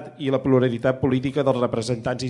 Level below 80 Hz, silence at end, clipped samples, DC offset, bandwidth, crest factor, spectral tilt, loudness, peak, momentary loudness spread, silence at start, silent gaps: -54 dBFS; 0 s; under 0.1%; under 0.1%; 11 kHz; 16 dB; -7 dB/octave; -22 LUFS; -6 dBFS; 6 LU; 0 s; none